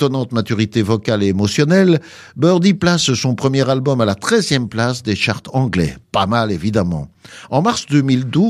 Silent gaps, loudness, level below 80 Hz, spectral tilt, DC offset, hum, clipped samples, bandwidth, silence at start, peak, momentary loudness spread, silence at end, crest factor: none; -16 LUFS; -46 dBFS; -5.5 dB/octave; under 0.1%; none; under 0.1%; 14 kHz; 0 s; 0 dBFS; 6 LU; 0 s; 16 dB